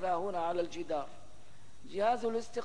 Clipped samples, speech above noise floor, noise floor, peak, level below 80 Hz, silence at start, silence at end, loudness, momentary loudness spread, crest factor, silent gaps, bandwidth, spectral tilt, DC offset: under 0.1%; 25 dB; -60 dBFS; -20 dBFS; -66 dBFS; 0 s; 0 s; -35 LUFS; 9 LU; 16 dB; none; 10.5 kHz; -5 dB/octave; 0.8%